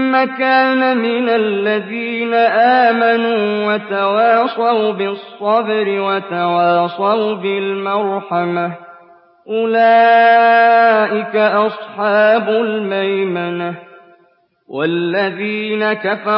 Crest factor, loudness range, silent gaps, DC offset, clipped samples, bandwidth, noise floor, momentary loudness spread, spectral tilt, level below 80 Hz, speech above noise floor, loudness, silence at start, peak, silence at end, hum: 12 dB; 6 LU; none; under 0.1%; under 0.1%; 5.6 kHz; -55 dBFS; 10 LU; -10.5 dB/octave; -74 dBFS; 41 dB; -14 LUFS; 0 s; -2 dBFS; 0 s; none